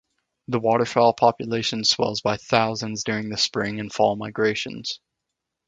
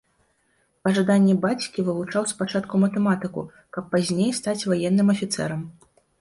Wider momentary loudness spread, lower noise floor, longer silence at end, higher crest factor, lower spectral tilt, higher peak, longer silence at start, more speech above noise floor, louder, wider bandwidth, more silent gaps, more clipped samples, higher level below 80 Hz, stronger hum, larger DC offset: second, 9 LU vs 12 LU; first, -82 dBFS vs -67 dBFS; first, 0.7 s vs 0.5 s; first, 22 dB vs 14 dB; second, -4 dB/octave vs -5.5 dB/octave; first, 0 dBFS vs -8 dBFS; second, 0.5 s vs 0.85 s; first, 60 dB vs 45 dB; about the same, -22 LUFS vs -23 LUFS; second, 9.4 kHz vs 11.5 kHz; neither; neither; about the same, -60 dBFS vs -62 dBFS; neither; neither